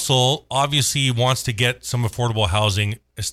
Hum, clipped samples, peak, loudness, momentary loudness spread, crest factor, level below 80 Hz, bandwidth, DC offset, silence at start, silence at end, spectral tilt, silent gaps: none; under 0.1%; -6 dBFS; -20 LUFS; 6 LU; 14 dB; -42 dBFS; 15 kHz; under 0.1%; 0 s; 0 s; -3.5 dB/octave; none